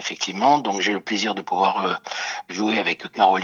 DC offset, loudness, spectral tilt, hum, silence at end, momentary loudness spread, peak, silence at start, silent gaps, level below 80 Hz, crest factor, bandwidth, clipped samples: under 0.1%; -22 LUFS; -3 dB/octave; none; 0 s; 8 LU; -4 dBFS; 0 s; none; -76 dBFS; 18 dB; 7.6 kHz; under 0.1%